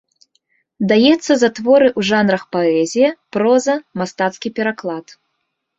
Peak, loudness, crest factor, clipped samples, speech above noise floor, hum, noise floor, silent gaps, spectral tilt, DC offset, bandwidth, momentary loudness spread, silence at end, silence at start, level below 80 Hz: -2 dBFS; -16 LUFS; 14 dB; under 0.1%; 57 dB; none; -73 dBFS; none; -5 dB/octave; under 0.1%; 8 kHz; 10 LU; 0.75 s; 0.8 s; -60 dBFS